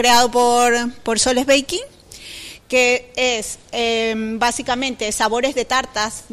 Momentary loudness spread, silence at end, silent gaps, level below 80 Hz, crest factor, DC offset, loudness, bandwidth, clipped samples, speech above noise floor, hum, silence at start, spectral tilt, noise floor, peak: 12 LU; 0.1 s; none; -46 dBFS; 14 dB; under 0.1%; -18 LUFS; 15.5 kHz; under 0.1%; 19 dB; none; 0 s; -1.5 dB/octave; -37 dBFS; -4 dBFS